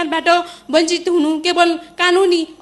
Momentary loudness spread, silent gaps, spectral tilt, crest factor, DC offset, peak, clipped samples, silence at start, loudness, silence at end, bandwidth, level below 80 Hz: 3 LU; none; -1.5 dB/octave; 14 dB; under 0.1%; 0 dBFS; under 0.1%; 0 s; -15 LUFS; 0.1 s; 12 kHz; -58 dBFS